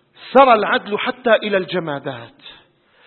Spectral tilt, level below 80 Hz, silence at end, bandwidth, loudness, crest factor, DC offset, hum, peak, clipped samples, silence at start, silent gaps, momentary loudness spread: -7.5 dB/octave; -60 dBFS; 0.55 s; 4.4 kHz; -16 LUFS; 18 dB; under 0.1%; none; 0 dBFS; under 0.1%; 0.2 s; none; 16 LU